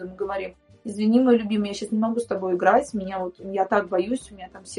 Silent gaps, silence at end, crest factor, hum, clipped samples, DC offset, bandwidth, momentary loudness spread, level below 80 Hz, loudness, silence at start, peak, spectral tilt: none; 0 s; 20 dB; none; under 0.1%; under 0.1%; 11.5 kHz; 15 LU; -58 dBFS; -23 LUFS; 0 s; -4 dBFS; -6 dB/octave